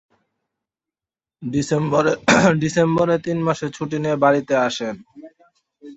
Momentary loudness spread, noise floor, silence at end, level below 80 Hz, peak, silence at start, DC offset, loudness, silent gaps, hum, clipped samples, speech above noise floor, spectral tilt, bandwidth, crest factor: 11 LU; under -90 dBFS; 0 s; -54 dBFS; 0 dBFS; 1.4 s; under 0.1%; -19 LUFS; none; none; under 0.1%; over 71 dB; -5.5 dB/octave; 8.2 kHz; 20 dB